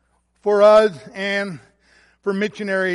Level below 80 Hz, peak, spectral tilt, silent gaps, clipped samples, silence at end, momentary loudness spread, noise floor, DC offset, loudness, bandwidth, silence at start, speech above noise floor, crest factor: -60 dBFS; -2 dBFS; -5.5 dB/octave; none; under 0.1%; 0 s; 16 LU; -56 dBFS; under 0.1%; -18 LUFS; 11.5 kHz; 0.45 s; 39 dB; 16 dB